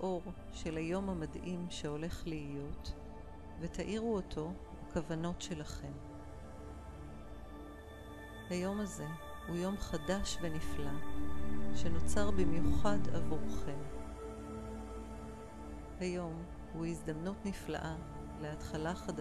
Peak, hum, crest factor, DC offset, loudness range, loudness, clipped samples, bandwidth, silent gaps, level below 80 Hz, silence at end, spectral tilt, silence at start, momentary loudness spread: -18 dBFS; none; 18 dB; under 0.1%; 7 LU; -41 LUFS; under 0.1%; 14 kHz; none; -48 dBFS; 0 s; -6 dB/octave; 0 s; 14 LU